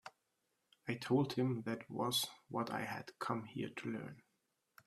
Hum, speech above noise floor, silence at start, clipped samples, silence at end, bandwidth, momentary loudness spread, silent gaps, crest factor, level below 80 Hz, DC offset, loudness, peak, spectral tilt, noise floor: none; 44 dB; 0.05 s; under 0.1%; 0.65 s; 15 kHz; 10 LU; none; 20 dB; -80 dBFS; under 0.1%; -40 LUFS; -22 dBFS; -5 dB/octave; -84 dBFS